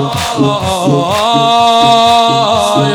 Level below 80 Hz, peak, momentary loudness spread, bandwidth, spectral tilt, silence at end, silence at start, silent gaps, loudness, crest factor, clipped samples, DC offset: -42 dBFS; 0 dBFS; 5 LU; 19 kHz; -4.5 dB/octave; 0 s; 0 s; none; -9 LUFS; 10 dB; 0.2%; under 0.1%